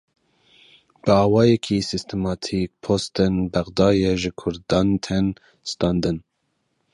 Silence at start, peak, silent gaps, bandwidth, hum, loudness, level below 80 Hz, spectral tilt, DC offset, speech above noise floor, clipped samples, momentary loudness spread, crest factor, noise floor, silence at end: 1.05 s; -4 dBFS; none; 11.5 kHz; none; -21 LUFS; -42 dBFS; -6.5 dB/octave; under 0.1%; 51 dB; under 0.1%; 9 LU; 18 dB; -72 dBFS; 0.75 s